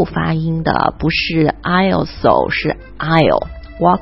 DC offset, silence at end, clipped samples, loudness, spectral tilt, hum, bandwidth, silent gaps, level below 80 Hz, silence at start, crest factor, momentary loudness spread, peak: under 0.1%; 0 s; under 0.1%; -15 LUFS; -9 dB/octave; none; 5.8 kHz; none; -34 dBFS; 0 s; 16 dB; 6 LU; 0 dBFS